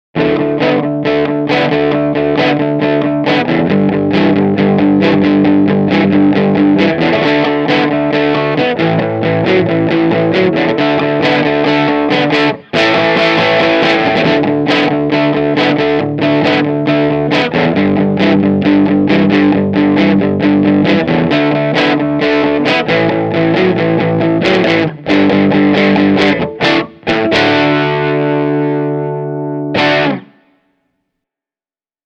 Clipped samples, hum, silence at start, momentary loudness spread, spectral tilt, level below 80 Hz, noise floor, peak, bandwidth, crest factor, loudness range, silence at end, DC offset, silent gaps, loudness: under 0.1%; none; 0.15 s; 4 LU; -7 dB/octave; -46 dBFS; under -90 dBFS; 0 dBFS; 7.4 kHz; 12 dB; 2 LU; 1.85 s; under 0.1%; none; -11 LUFS